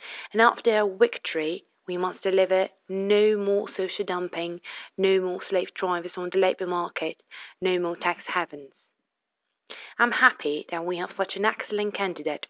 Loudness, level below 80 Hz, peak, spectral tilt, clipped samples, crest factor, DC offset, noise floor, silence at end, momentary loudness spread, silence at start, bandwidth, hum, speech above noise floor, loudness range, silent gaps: -26 LUFS; -82 dBFS; -4 dBFS; -8.5 dB/octave; under 0.1%; 22 dB; under 0.1%; -82 dBFS; 0.15 s; 13 LU; 0 s; 4 kHz; none; 56 dB; 4 LU; none